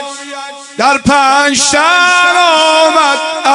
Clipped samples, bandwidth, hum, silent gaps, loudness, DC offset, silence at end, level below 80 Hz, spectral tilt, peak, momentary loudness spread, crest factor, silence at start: 0.8%; 12 kHz; none; none; -8 LUFS; under 0.1%; 0 s; -44 dBFS; -1.5 dB/octave; 0 dBFS; 16 LU; 10 dB; 0 s